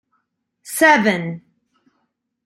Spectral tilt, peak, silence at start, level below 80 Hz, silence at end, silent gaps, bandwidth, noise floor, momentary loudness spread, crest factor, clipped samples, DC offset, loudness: -4 dB/octave; -2 dBFS; 0.65 s; -68 dBFS; 1.1 s; none; 16 kHz; -71 dBFS; 18 LU; 20 dB; under 0.1%; under 0.1%; -15 LUFS